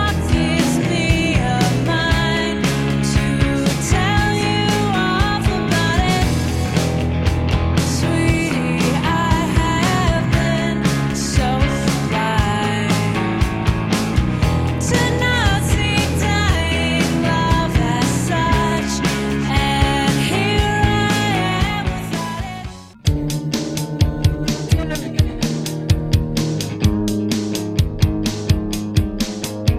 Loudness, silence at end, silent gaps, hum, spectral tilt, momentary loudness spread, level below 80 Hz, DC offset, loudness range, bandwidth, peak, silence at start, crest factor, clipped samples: -18 LUFS; 0 s; none; none; -5 dB/octave; 5 LU; -26 dBFS; under 0.1%; 3 LU; 16 kHz; -2 dBFS; 0 s; 16 dB; under 0.1%